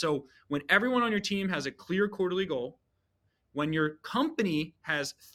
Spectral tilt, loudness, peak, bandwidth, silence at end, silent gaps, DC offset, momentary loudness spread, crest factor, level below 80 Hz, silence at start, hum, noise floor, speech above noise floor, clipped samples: -5 dB/octave; -30 LUFS; -8 dBFS; 15.5 kHz; 0.1 s; none; under 0.1%; 10 LU; 22 dB; -68 dBFS; 0 s; none; -76 dBFS; 45 dB; under 0.1%